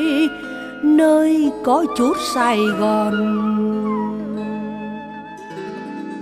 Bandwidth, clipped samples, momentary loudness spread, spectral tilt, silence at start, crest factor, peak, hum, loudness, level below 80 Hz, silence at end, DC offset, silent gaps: 15.5 kHz; under 0.1%; 16 LU; -5.5 dB/octave; 0 s; 14 dB; -4 dBFS; none; -18 LUFS; -54 dBFS; 0 s; under 0.1%; none